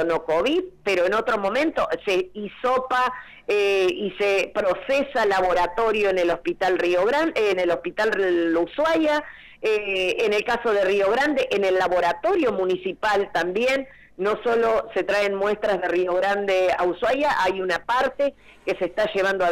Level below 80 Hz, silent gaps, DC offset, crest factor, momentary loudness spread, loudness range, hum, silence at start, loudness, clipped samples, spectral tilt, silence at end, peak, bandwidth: -52 dBFS; none; under 0.1%; 8 dB; 5 LU; 2 LU; none; 0 s; -22 LUFS; under 0.1%; -4.5 dB/octave; 0 s; -14 dBFS; 15.5 kHz